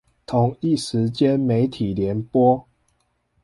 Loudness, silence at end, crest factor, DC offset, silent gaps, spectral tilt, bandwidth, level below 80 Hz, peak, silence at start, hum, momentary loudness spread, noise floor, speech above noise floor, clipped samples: -21 LUFS; 0.85 s; 16 dB; under 0.1%; none; -7.5 dB/octave; 11.5 kHz; -50 dBFS; -6 dBFS; 0.3 s; none; 6 LU; -68 dBFS; 48 dB; under 0.1%